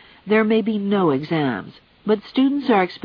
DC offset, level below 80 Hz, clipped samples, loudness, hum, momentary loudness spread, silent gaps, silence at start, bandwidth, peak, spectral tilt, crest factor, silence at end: under 0.1%; -62 dBFS; under 0.1%; -20 LUFS; none; 6 LU; none; 0.25 s; 5.4 kHz; -4 dBFS; -9 dB/octave; 16 dB; 0.05 s